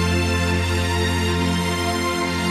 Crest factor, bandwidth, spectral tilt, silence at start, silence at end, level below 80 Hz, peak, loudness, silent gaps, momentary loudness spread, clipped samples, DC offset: 12 dB; 14.5 kHz; -5 dB/octave; 0 s; 0 s; -34 dBFS; -8 dBFS; -21 LUFS; none; 2 LU; under 0.1%; under 0.1%